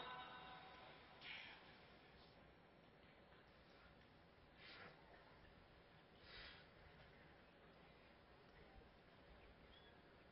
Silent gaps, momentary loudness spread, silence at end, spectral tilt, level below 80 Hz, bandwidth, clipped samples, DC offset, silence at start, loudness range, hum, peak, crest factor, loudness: none; 12 LU; 0 s; -2 dB/octave; -76 dBFS; 5.6 kHz; under 0.1%; under 0.1%; 0 s; 6 LU; none; -40 dBFS; 22 dB; -63 LUFS